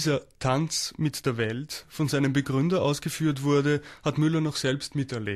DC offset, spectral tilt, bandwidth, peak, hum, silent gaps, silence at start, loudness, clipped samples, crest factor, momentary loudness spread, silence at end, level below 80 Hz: under 0.1%; -5.5 dB/octave; 14 kHz; -12 dBFS; none; none; 0 s; -27 LUFS; under 0.1%; 14 dB; 6 LU; 0 s; -56 dBFS